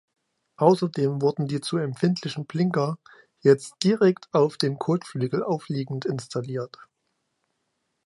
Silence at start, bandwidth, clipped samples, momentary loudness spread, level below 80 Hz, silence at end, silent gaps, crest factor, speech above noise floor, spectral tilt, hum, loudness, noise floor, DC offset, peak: 0.6 s; 11.5 kHz; under 0.1%; 10 LU; -72 dBFS; 1.4 s; none; 22 dB; 53 dB; -6.5 dB/octave; none; -25 LUFS; -76 dBFS; under 0.1%; -4 dBFS